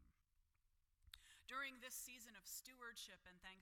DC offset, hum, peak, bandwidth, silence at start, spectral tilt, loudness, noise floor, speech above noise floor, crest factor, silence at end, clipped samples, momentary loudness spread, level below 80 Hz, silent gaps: under 0.1%; none; -38 dBFS; 18 kHz; 0 s; 0 dB/octave; -54 LUFS; -83 dBFS; 24 dB; 20 dB; 0 s; under 0.1%; 13 LU; -80 dBFS; none